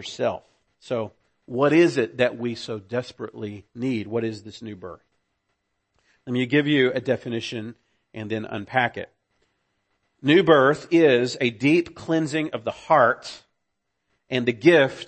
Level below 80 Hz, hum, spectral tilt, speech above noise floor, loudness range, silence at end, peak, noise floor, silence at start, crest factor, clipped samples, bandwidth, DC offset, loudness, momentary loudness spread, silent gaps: -66 dBFS; none; -6 dB/octave; 55 dB; 10 LU; 0.05 s; -2 dBFS; -77 dBFS; 0 s; 20 dB; under 0.1%; 8.6 kHz; under 0.1%; -22 LUFS; 20 LU; none